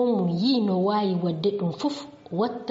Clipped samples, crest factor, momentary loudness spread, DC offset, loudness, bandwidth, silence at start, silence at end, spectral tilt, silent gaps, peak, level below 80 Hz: under 0.1%; 12 dB; 7 LU; under 0.1%; -25 LUFS; 7.8 kHz; 0 s; 0 s; -6.5 dB/octave; none; -12 dBFS; -68 dBFS